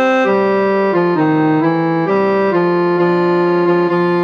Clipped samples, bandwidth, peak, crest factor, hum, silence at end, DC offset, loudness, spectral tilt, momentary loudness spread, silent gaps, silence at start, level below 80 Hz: under 0.1%; 6.6 kHz; -2 dBFS; 10 dB; none; 0 s; under 0.1%; -14 LUFS; -8.5 dB/octave; 1 LU; none; 0 s; -64 dBFS